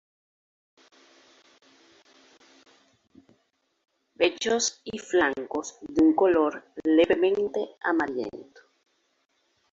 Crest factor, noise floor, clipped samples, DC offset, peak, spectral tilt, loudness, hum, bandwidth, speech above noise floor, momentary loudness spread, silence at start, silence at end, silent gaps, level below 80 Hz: 20 dB; -73 dBFS; under 0.1%; under 0.1%; -8 dBFS; -3 dB/octave; -25 LUFS; none; 7.8 kHz; 48 dB; 13 LU; 4.2 s; 1.3 s; none; -62 dBFS